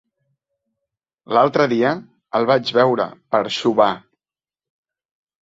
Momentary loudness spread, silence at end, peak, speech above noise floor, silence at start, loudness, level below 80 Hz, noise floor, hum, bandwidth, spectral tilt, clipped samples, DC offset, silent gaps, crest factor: 7 LU; 1.45 s; -2 dBFS; over 73 dB; 1.3 s; -18 LUFS; -64 dBFS; under -90 dBFS; none; 7.8 kHz; -5.5 dB/octave; under 0.1%; under 0.1%; none; 18 dB